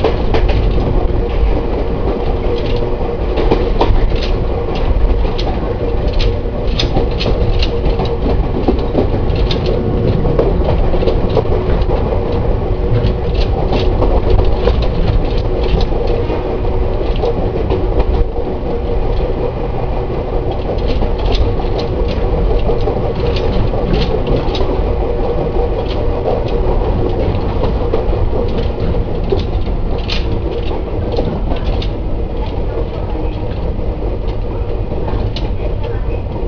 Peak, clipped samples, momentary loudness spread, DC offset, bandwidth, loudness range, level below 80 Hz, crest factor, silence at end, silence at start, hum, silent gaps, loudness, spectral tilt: 0 dBFS; under 0.1%; 5 LU; under 0.1%; 5.4 kHz; 4 LU; -16 dBFS; 14 dB; 0 s; 0 s; none; none; -17 LUFS; -8 dB/octave